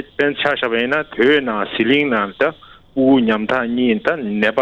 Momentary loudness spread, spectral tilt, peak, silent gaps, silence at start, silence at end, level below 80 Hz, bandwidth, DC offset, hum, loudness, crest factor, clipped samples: 5 LU; -6.5 dB/octave; -2 dBFS; none; 0 s; 0 s; -52 dBFS; 7.2 kHz; under 0.1%; none; -17 LUFS; 14 dB; under 0.1%